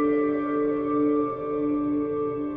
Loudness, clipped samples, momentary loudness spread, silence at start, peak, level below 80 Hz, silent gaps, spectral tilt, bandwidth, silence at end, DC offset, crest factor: -25 LUFS; under 0.1%; 4 LU; 0 s; -14 dBFS; -56 dBFS; none; -10.5 dB/octave; 3.7 kHz; 0 s; under 0.1%; 10 dB